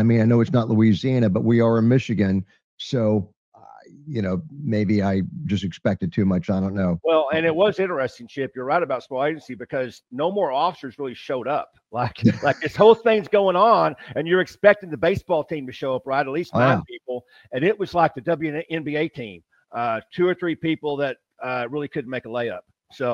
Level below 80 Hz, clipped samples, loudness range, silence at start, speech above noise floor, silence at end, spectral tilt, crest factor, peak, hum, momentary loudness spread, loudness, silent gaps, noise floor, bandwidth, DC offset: -58 dBFS; under 0.1%; 7 LU; 0 s; 25 dB; 0 s; -8 dB/octave; 20 dB; 0 dBFS; none; 13 LU; -22 LUFS; 2.64-2.77 s, 3.37-3.52 s; -47 dBFS; 7.4 kHz; under 0.1%